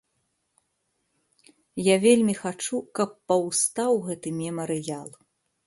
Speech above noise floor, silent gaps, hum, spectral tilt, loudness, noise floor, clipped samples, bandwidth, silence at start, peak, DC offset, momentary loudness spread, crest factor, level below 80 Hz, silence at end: 51 dB; none; none; -4 dB/octave; -25 LUFS; -75 dBFS; under 0.1%; 12 kHz; 1.75 s; -6 dBFS; under 0.1%; 13 LU; 20 dB; -70 dBFS; 0.6 s